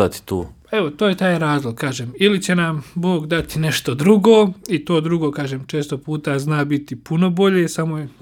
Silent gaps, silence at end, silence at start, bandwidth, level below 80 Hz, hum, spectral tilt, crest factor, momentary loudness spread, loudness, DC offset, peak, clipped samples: none; 0.1 s; 0 s; 17.5 kHz; -48 dBFS; none; -6 dB/octave; 18 dB; 10 LU; -18 LUFS; under 0.1%; 0 dBFS; under 0.1%